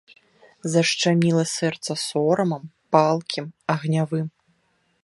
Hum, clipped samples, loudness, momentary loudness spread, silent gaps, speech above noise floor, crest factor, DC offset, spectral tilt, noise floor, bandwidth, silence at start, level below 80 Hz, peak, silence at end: none; under 0.1%; -22 LUFS; 10 LU; none; 46 dB; 22 dB; under 0.1%; -5 dB/octave; -67 dBFS; 11.5 kHz; 0.65 s; -68 dBFS; -2 dBFS; 0.75 s